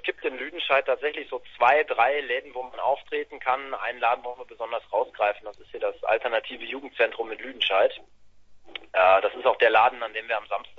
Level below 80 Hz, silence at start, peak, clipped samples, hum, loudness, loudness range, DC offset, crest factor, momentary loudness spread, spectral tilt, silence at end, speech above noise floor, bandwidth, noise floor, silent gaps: -66 dBFS; 0.05 s; -6 dBFS; under 0.1%; none; -25 LUFS; 5 LU; under 0.1%; 20 dB; 15 LU; -4 dB/octave; 0 s; 23 dB; 7 kHz; -48 dBFS; none